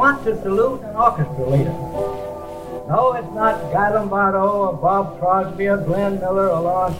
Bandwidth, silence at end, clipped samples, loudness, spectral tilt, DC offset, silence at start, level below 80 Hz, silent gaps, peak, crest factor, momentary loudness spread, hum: 16.5 kHz; 0 s; under 0.1%; -19 LUFS; -8 dB/octave; under 0.1%; 0 s; -44 dBFS; none; -2 dBFS; 18 dB; 7 LU; none